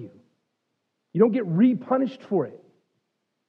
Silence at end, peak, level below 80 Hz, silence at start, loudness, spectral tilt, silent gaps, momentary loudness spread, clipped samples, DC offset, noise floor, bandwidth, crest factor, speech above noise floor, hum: 0.9 s; -6 dBFS; under -90 dBFS; 0 s; -23 LUFS; -10.5 dB/octave; none; 9 LU; under 0.1%; under 0.1%; -78 dBFS; 5.6 kHz; 20 dB; 56 dB; none